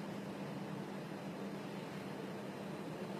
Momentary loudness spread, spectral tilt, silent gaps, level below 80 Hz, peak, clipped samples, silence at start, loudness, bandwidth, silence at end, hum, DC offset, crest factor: 1 LU; -6 dB/octave; none; -80 dBFS; -32 dBFS; under 0.1%; 0 s; -46 LUFS; 15 kHz; 0 s; none; under 0.1%; 12 dB